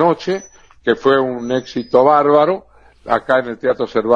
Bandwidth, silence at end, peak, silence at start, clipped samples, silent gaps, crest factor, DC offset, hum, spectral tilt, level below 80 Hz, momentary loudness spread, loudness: 7.2 kHz; 0 s; 0 dBFS; 0 s; under 0.1%; none; 16 dB; 0.1%; none; -6 dB/octave; -52 dBFS; 12 LU; -16 LUFS